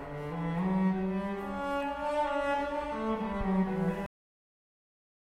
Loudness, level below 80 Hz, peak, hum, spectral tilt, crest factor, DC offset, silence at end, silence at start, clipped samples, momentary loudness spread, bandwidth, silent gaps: -32 LUFS; -50 dBFS; -20 dBFS; none; -8 dB/octave; 14 dB; under 0.1%; 1.3 s; 0 s; under 0.1%; 6 LU; 10.5 kHz; none